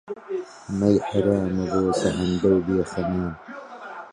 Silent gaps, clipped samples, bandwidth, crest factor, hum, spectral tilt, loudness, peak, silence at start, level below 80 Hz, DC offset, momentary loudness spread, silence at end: none; under 0.1%; 11 kHz; 18 dB; none; -7 dB/octave; -23 LUFS; -6 dBFS; 0.05 s; -46 dBFS; under 0.1%; 17 LU; 0 s